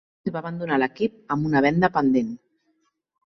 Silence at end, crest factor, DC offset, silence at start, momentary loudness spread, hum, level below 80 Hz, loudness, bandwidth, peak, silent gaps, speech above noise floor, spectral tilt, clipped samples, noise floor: 0.9 s; 18 dB; under 0.1%; 0.25 s; 11 LU; none; -56 dBFS; -23 LUFS; 6.4 kHz; -6 dBFS; none; 48 dB; -8 dB/octave; under 0.1%; -71 dBFS